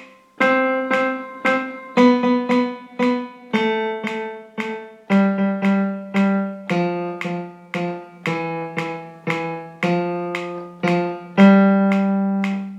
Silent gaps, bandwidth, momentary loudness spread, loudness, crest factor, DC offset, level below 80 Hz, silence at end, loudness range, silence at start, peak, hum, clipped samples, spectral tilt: none; 8.2 kHz; 13 LU; -20 LUFS; 18 dB; under 0.1%; -74 dBFS; 0 s; 7 LU; 0 s; -2 dBFS; none; under 0.1%; -7.5 dB/octave